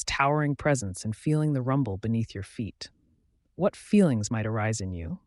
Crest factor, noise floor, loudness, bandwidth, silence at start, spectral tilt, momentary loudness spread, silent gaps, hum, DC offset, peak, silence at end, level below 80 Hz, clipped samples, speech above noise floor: 18 dB; -68 dBFS; -27 LUFS; 11.5 kHz; 0 s; -6 dB/octave; 13 LU; none; none; under 0.1%; -10 dBFS; 0.1 s; -52 dBFS; under 0.1%; 41 dB